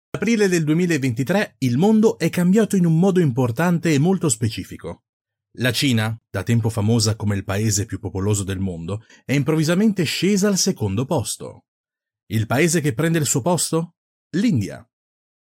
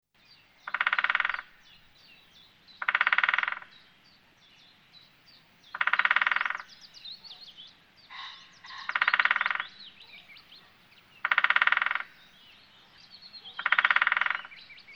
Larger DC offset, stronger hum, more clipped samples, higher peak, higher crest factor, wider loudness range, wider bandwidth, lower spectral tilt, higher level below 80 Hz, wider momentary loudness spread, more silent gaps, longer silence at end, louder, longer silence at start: neither; neither; neither; about the same, -6 dBFS vs -6 dBFS; second, 14 dB vs 26 dB; about the same, 4 LU vs 3 LU; first, 16.5 kHz vs 7.4 kHz; first, -5 dB/octave vs -0.5 dB/octave; first, -56 dBFS vs -74 dBFS; second, 11 LU vs 23 LU; first, 5.09-5.25 s, 11.68-11.84 s, 12.23-12.27 s, 13.97-14.30 s vs none; first, 0.65 s vs 0 s; first, -20 LUFS vs -26 LUFS; second, 0.15 s vs 0.65 s